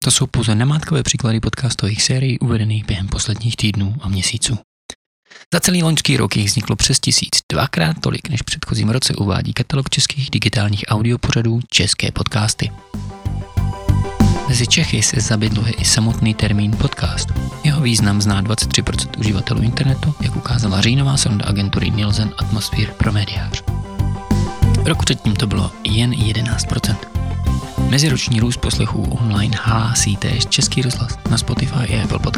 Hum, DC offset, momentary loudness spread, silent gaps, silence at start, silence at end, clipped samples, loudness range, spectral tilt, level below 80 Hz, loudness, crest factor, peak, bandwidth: none; 0.1%; 7 LU; 4.64-4.89 s, 4.95-5.23 s, 5.46-5.51 s, 7.43-7.49 s; 0 s; 0 s; under 0.1%; 3 LU; -4 dB/octave; -30 dBFS; -17 LUFS; 16 dB; 0 dBFS; 15.5 kHz